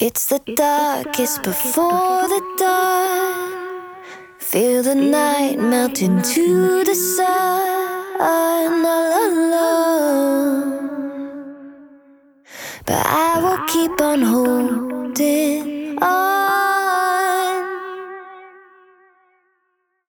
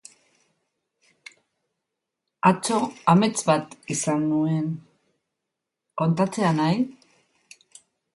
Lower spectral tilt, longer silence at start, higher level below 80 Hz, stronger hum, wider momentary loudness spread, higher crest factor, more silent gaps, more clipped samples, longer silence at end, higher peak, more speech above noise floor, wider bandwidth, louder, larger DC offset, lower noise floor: second, -4 dB/octave vs -5.5 dB/octave; second, 0 s vs 2.45 s; first, -58 dBFS vs -68 dBFS; neither; about the same, 13 LU vs 11 LU; second, 14 dB vs 22 dB; neither; neither; first, 1.6 s vs 1.25 s; about the same, -4 dBFS vs -2 dBFS; second, 52 dB vs 62 dB; first, over 20 kHz vs 11.5 kHz; first, -17 LUFS vs -23 LUFS; neither; second, -69 dBFS vs -84 dBFS